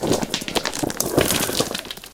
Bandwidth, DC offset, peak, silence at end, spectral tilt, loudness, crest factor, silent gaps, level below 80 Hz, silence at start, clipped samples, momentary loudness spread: 19 kHz; under 0.1%; 0 dBFS; 0 s; -3 dB/octave; -22 LUFS; 22 dB; none; -44 dBFS; 0 s; under 0.1%; 6 LU